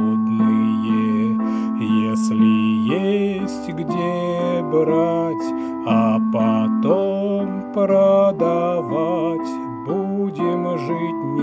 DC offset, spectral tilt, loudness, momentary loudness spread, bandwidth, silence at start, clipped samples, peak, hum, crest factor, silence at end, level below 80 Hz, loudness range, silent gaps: under 0.1%; -8 dB/octave; -19 LUFS; 8 LU; 8 kHz; 0 s; under 0.1%; -4 dBFS; none; 14 dB; 0 s; -58 dBFS; 2 LU; none